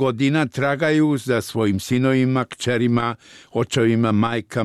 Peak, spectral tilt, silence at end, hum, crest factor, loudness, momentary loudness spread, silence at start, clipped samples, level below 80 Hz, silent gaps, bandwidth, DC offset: -8 dBFS; -6 dB/octave; 0 s; none; 12 dB; -20 LUFS; 5 LU; 0 s; under 0.1%; -56 dBFS; none; 14 kHz; under 0.1%